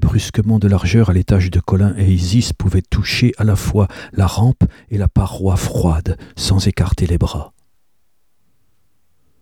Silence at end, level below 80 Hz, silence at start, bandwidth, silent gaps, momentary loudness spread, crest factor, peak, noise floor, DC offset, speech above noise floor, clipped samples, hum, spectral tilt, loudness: 1.95 s; -26 dBFS; 0 s; 14.5 kHz; none; 6 LU; 14 dB; -2 dBFS; -69 dBFS; 0.2%; 54 dB; under 0.1%; none; -6.5 dB/octave; -16 LUFS